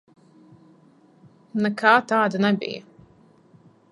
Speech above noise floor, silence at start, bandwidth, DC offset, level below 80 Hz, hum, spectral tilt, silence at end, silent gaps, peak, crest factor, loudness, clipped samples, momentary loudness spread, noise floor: 35 dB; 1.55 s; 11 kHz; under 0.1%; -72 dBFS; none; -6 dB/octave; 1.1 s; none; -2 dBFS; 24 dB; -21 LUFS; under 0.1%; 15 LU; -55 dBFS